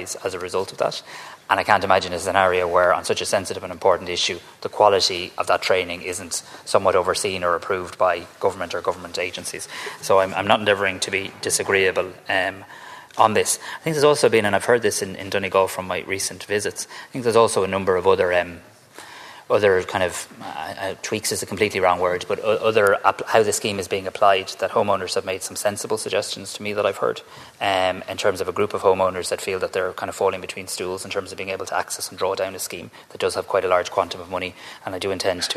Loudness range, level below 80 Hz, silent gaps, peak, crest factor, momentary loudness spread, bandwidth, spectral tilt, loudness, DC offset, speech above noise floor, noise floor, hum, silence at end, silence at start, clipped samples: 5 LU; -60 dBFS; none; 0 dBFS; 22 dB; 11 LU; 14 kHz; -3 dB/octave; -21 LUFS; under 0.1%; 21 dB; -43 dBFS; none; 0 s; 0 s; under 0.1%